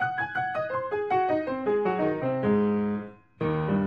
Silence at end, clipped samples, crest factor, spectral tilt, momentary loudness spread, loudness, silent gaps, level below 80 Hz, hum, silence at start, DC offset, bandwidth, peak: 0 s; under 0.1%; 14 dB; -9.5 dB/octave; 6 LU; -27 LUFS; none; -58 dBFS; none; 0 s; under 0.1%; 5.4 kHz; -14 dBFS